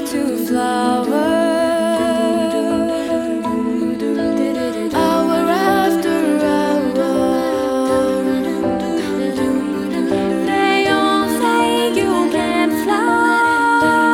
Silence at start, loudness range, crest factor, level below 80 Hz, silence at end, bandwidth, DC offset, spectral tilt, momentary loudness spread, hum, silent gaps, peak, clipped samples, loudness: 0 s; 3 LU; 14 dB; -48 dBFS; 0 s; 17.5 kHz; under 0.1%; -4.5 dB/octave; 5 LU; none; none; -2 dBFS; under 0.1%; -16 LUFS